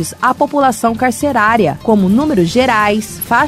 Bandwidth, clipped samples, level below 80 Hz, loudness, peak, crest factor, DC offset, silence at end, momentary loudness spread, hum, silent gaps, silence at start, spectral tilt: 16 kHz; under 0.1%; -42 dBFS; -13 LUFS; 0 dBFS; 12 dB; under 0.1%; 0 s; 4 LU; none; none; 0 s; -5 dB/octave